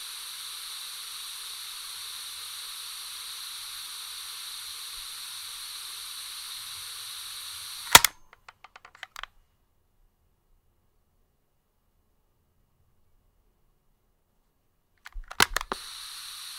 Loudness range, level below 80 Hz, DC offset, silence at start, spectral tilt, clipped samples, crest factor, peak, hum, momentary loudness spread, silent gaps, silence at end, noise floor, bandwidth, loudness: 11 LU; -54 dBFS; under 0.1%; 0 s; 0.5 dB/octave; under 0.1%; 34 dB; 0 dBFS; none; 14 LU; none; 0 s; -71 dBFS; 16 kHz; -29 LUFS